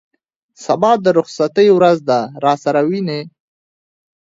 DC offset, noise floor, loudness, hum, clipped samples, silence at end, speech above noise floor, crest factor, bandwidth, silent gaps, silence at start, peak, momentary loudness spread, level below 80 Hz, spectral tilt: under 0.1%; under -90 dBFS; -14 LUFS; none; under 0.1%; 1.05 s; over 76 dB; 16 dB; 7.8 kHz; none; 0.6 s; 0 dBFS; 10 LU; -62 dBFS; -6 dB/octave